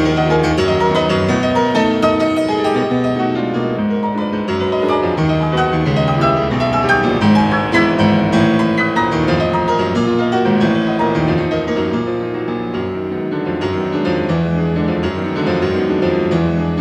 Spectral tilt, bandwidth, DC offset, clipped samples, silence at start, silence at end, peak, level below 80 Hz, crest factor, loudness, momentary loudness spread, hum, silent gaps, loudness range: -7 dB/octave; 10.5 kHz; under 0.1%; under 0.1%; 0 s; 0 s; -2 dBFS; -40 dBFS; 14 dB; -16 LUFS; 6 LU; none; none; 5 LU